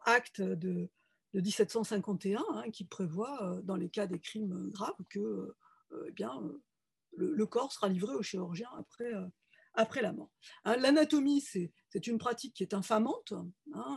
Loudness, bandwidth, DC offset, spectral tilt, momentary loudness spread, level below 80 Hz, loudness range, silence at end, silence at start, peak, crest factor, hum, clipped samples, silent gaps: -35 LUFS; 12.5 kHz; under 0.1%; -5.5 dB/octave; 14 LU; -82 dBFS; 7 LU; 0 s; 0.05 s; -14 dBFS; 22 dB; none; under 0.1%; none